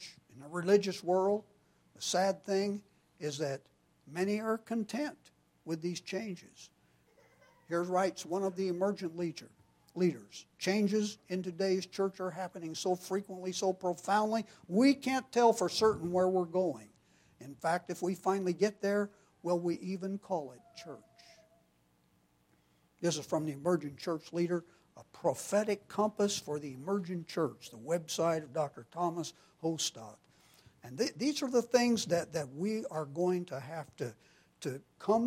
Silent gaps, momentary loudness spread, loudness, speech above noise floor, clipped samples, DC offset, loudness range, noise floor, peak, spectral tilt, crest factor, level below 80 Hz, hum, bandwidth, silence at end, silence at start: none; 14 LU; -34 LUFS; 38 dB; under 0.1%; under 0.1%; 8 LU; -71 dBFS; -14 dBFS; -5 dB/octave; 22 dB; -76 dBFS; none; 16 kHz; 0 s; 0 s